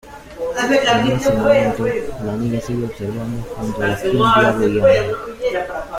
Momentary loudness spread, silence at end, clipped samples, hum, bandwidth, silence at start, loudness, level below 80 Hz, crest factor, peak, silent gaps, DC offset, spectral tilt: 12 LU; 0 s; under 0.1%; none; 16 kHz; 0.05 s; -17 LUFS; -40 dBFS; 16 dB; -2 dBFS; none; under 0.1%; -5.5 dB/octave